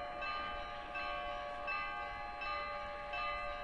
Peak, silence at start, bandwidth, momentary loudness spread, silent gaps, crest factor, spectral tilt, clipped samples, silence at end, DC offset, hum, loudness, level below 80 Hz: -28 dBFS; 0 s; 11 kHz; 4 LU; none; 14 dB; -4 dB/octave; under 0.1%; 0 s; under 0.1%; none; -41 LUFS; -56 dBFS